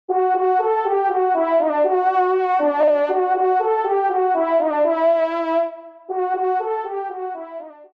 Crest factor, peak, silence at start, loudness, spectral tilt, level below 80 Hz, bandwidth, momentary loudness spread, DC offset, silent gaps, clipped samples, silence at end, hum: 10 dB; -8 dBFS; 0.1 s; -19 LUFS; -5 dB/octave; -80 dBFS; 5.2 kHz; 10 LU; under 0.1%; none; under 0.1%; 0.15 s; none